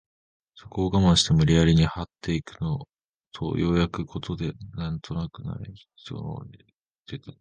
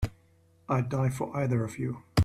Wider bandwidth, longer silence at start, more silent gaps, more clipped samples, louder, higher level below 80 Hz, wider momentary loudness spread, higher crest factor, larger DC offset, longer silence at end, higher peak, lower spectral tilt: second, 9.8 kHz vs 15 kHz; first, 0.55 s vs 0 s; first, 2.89-2.93 s, 3.05-3.18 s, 6.80-6.84 s vs none; neither; first, -25 LUFS vs -31 LUFS; first, -40 dBFS vs -48 dBFS; first, 21 LU vs 6 LU; about the same, 20 dB vs 20 dB; neither; about the same, 0.1 s vs 0 s; first, -6 dBFS vs -10 dBFS; about the same, -6 dB/octave vs -7 dB/octave